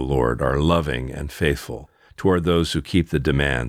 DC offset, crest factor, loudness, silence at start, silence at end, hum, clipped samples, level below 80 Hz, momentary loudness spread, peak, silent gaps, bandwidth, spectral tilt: under 0.1%; 16 dB; -21 LUFS; 0 s; 0 s; none; under 0.1%; -32 dBFS; 9 LU; -4 dBFS; none; 16 kHz; -6 dB/octave